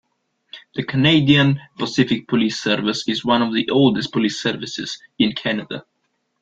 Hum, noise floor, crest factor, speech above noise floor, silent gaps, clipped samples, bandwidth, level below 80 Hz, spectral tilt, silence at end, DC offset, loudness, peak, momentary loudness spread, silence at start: none; -71 dBFS; 18 dB; 52 dB; none; under 0.1%; 7.8 kHz; -56 dBFS; -5.5 dB/octave; 0.6 s; under 0.1%; -19 LUFS; 0 dBFS; 13 LU; 0.55 s